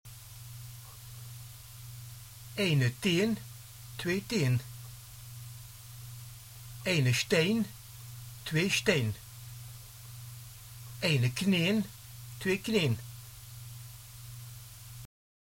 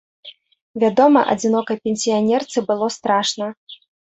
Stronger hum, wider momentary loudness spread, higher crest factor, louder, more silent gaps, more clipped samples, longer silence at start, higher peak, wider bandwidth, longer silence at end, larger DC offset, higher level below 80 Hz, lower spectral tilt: neither; first, 20 LU vs 13 LU; first, 22 dB vs 16 dB; second, -30 LUFS vs -18 LUFS; second, none vs 0.61-0.74 s, 3.57-3.67 s; neither; second, 0.05 s vs 0.25 s; second, -12 dBFS vs -2 dBFS; first, 17 kHz vs 8.4 kHz; about the same, 0.5 s vs 0.4 s; neither; about the same, -60 dBFS vs -64 dBFS; about the same, -5 dB/octave vs -4 dB/octave